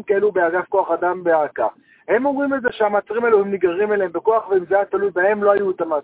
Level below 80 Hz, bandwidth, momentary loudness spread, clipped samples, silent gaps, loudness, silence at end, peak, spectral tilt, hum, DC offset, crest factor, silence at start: -60 dBFS; 4 kHz; 4 LU; under 0.1%; none; -19 LUFS; 0 s; -2 dBFS; -9.5 dB/octave; none; under 0.1%; 16 dB; 0.1 s